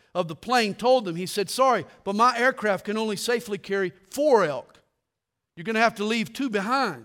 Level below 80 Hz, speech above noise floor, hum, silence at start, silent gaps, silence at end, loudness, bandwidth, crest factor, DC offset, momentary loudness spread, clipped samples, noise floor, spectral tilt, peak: -68 dBFS; 60 dB; none; 0.15 s; none; 0 s; -24 LUFS; 17.5 kHz; 18 dB; under 0.1%; 9 LU; under 0.1%; -84 dBFS; -4 dB/octave; -6 dBFS